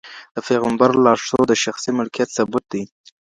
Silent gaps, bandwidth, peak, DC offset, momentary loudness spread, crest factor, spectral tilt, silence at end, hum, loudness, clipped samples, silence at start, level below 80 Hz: 0.31-0.35 s; 11 kHz; 0 dBFS; under 0.1%; 14 LU; 18 dB; -4.5 dB/octave; 0.4 s; none; -18 LUFS; under 0.1%; 0.05 s; -56 dBFS